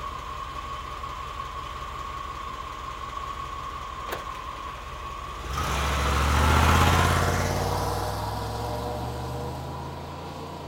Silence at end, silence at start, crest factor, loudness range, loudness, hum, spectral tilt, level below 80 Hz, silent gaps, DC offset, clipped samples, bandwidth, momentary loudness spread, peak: 0 s; 0 s; 22 dB; 11 LU; -28 LUFS; none; -4.5 dB/octave; -36 dBFS; none; under 0.1%; under 0.1%; 17 kHz; 15 LU; -6 dBFS